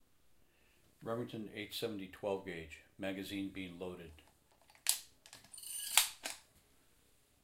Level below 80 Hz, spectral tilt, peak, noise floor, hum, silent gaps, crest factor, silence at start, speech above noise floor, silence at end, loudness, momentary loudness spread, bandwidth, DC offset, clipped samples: -72 dBFS; -2 dB/octave; -8 dBFS; -71 dBFS; none; none; 36 dB; 1 s; 28 dB; 0.85 s; -39 LUFS; 21 LU; 16 kHz; under 0.1%; under 0.1%